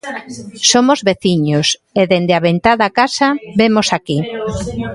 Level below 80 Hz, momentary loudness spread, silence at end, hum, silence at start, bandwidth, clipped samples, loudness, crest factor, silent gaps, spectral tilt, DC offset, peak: -42 dBFS; 10 LU; 0 s; none; 0.05 s; 11.5 kHz; under 0.1%; -14 LUFS; 14 dB; none; -4 dB/octave; under 0.1%; 0 dBFS